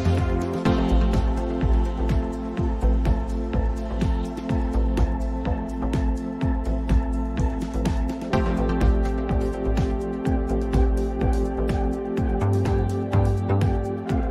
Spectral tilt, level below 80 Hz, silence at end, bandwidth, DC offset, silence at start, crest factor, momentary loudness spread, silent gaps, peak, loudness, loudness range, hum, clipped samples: -8 dB/octave; -24 dBFS; 0 s; 10 kHz; under 0.1%; 0 s; 14 dB; 5 LU; none; -10 dBFS; -24 LUFS; 2 LU; none; under 0.1%